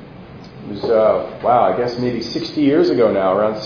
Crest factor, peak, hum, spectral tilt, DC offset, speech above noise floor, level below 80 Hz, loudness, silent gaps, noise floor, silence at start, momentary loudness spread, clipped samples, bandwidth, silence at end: 16 dB; -2 dBFS; none; -7 dB/octave; under 0.1%; 21 dB; -50 dBFS; -17 LUFS; none; -37 dBFS; 0 s; 16 LU; under 0.1%; 5.4 kHz; 0 s